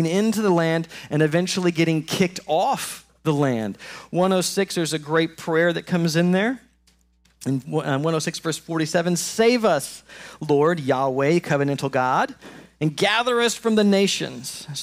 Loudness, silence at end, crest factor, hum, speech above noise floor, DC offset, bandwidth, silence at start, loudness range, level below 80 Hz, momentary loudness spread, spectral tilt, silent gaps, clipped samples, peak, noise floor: -22 LUFS; 0 s; 14 dB; none; 39 dB; under 0.1%; 16 kHz; 0 s; 2 LU; -62 dBFS; 9 LU; -5 dB/octave; none; under 0.1%; -8 dBFS; -61 dBFS